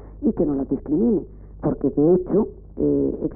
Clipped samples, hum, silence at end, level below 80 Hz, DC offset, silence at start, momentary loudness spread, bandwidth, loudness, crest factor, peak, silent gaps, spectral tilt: under 0.1%; none; 0 s; -40 dBFS; under 0.1%; 0 s; 9 LU; 2 kHz; -22 LUFS; 14 dB; -8 dBFS; none; -16 dB/octave